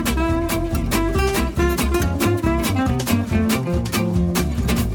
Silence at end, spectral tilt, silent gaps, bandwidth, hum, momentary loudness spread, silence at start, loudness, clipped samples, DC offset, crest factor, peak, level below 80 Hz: 0 s; -5.5 dB/octave; none; over 20 kHz; none; 2 LU; 0 s; -20 LUFS; under 0.1%; under 0.1%; 14 dB; -4 dBFS; -26 dBFS